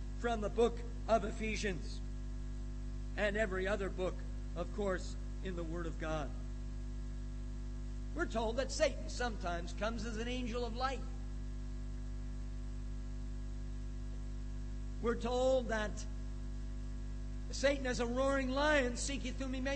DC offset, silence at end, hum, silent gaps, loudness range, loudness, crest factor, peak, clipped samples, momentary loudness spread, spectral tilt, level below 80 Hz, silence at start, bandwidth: under 0.1%; 0 s; 50 Hz at -40 dBFS; none; 7 LU; -39 LUFS; 18 dB; -18 dBFS; under 0.1%; 12 LU; -5 dB/octave; -42 dBFS; 0 s; 8.4 kHz